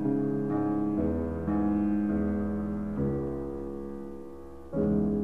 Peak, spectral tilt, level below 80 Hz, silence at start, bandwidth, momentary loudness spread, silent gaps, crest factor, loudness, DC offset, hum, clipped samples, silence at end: -16 dBFS; -11 dB/octave; -46 dBFS; 0 s; 3.3 kHz; 13 LU; none; 14 dB; -30 LUFS; 0.4%; none; under 0.1%; 0 s